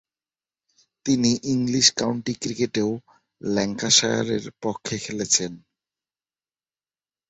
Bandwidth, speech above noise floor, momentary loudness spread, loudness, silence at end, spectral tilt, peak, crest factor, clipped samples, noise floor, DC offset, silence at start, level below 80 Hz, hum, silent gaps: 8.4 kHz; over 67 dB; 13 LU; -22 LUFS; 1.7 s; -3 dB/octave; -2 dBFS; 24 dB; under 0.1%; under -90 dBFS; under 0.1%; 1.05 s; -60 dBFS; none; none